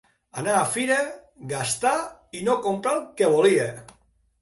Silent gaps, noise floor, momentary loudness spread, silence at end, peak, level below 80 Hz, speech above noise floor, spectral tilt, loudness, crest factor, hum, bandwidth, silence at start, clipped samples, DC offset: none; -61 dBFS; 15 LU; 0.6 s; -8 dBFS; -64 dBFS; 38 dB; -3.5 dB/octave; -23 LUFS; 18 dB; none; 12 kHz; 0.35 s; under 0.1%; under 0.1%